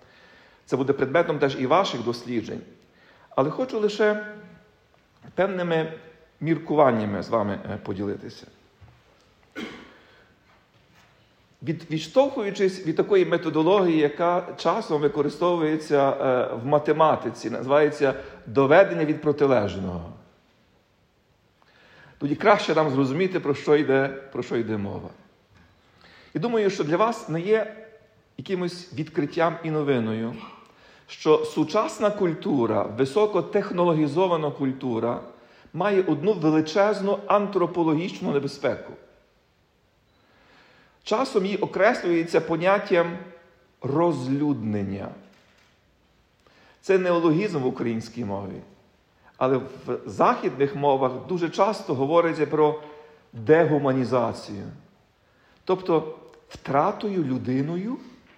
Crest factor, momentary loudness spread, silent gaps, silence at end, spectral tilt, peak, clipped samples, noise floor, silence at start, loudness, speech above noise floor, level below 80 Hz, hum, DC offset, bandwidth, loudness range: 20 dB; 15 LU; none; 0.3 s; -6.5 dB/octave; -4 dBFS; under 0.1%; -64 dBFS; 0.7 s; -24 LUFS; 41 dB; -66 dBFS; none; under 0.1%; 10.5 kHz; 6 LU